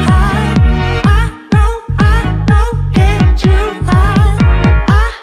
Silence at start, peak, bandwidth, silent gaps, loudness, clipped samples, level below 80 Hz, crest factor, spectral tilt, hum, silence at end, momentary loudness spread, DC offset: 0 s; 0 dBFS; 11.5 kHz; none; -11 LUFS; under 0.1%; -12 dBFS; 8 dB; -7 dB/octave; none; 0 s; 3 LU; under 0.1%